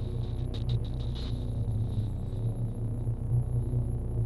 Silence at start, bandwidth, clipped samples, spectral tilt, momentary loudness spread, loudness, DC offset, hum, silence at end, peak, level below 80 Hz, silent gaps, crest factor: 0 s; 12 kHz; under 0.1%; -8.5 dB/octave; 4 LU; -33 LUFS; under 0.1%; none; 0 s; -18 dBFS; -36 dBFS; none; 12 dB